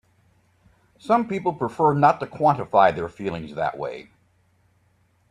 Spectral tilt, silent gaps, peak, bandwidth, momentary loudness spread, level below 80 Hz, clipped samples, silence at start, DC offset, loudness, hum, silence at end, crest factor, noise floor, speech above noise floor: -7.5 dB/octave; none; -4 dBFS; 10.5 kHz; 14 LU; -60 dBFS; under 0.1%; 1.05 s; under 0.1%; -22 LUFS; none; 1.3 s; 20 dB; -63 dBFS; 42 dB